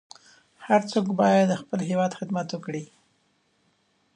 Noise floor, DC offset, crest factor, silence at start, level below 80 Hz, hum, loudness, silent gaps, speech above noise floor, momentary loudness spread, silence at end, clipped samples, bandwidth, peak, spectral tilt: -68 dBFS; under 0.1%; 18 dB; 0.6 s; -74 dBFS; none; -25 LUFS; none; 44 dB; 14 LU; 1.3 s; under 0.1%; 10 kHz; -8 dBFS; -6.5 dB/octave